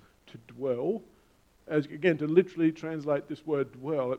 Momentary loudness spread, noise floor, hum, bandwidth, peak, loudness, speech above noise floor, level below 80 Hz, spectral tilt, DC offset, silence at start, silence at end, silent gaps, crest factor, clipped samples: 10 LU; -64 dBFS; none; 8 kHz; -8 dBFS; -30 LUFS; 35 dB; -70 dBFS; -8 dB/octave; under 0.1%; 0.35 s; 0 s; none; 22 dB; under 0.1%